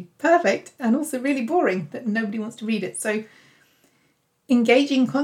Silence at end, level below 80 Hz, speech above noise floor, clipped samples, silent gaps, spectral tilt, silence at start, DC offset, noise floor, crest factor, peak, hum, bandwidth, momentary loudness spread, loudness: 0 s; -76 dBFS; 45 dB; under 0.1%; none; -4.5 dB/octave; 0 s; under 0.1%; -66 dBFS; 18 dB; -4 dBFS; none; 16 kHz; 9 LU; -22 LUFS